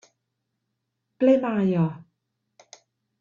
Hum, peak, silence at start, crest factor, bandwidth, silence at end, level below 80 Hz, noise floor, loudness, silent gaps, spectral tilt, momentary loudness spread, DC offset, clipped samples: none; -6 dBFS; 1.2 s; 20 dB; 7.4 kHz; 1.2 s; -70 dBFS; -80 dBFS; -23 LUFS; none; -8.5 dB/octave; 8 LU; under 0.1%; under 0.1%